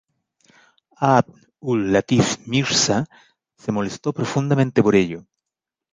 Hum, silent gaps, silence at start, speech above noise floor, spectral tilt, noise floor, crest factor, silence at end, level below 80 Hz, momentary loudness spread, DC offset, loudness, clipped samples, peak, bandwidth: none; none; 1 s; 67 dB; -5 dB/octave; -86 dBFS; 20 dB; 0.75 s; -54 dBFS; 12 LU; under 0.1%; -20 LUFS; under 0.1%; -2 dBFS; 10 kHz